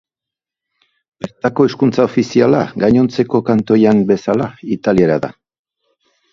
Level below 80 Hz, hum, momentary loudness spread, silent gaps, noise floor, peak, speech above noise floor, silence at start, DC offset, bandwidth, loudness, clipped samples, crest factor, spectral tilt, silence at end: -48 dBFS; none; 9 LU; none; -86 dBFS; 0 dBFS; 73 dB; 1.2 s; under 0.1%; 7.4 kHz; -14 LUFS; under 0.1%; 14 dB; -7.5 dB/octave; 1 s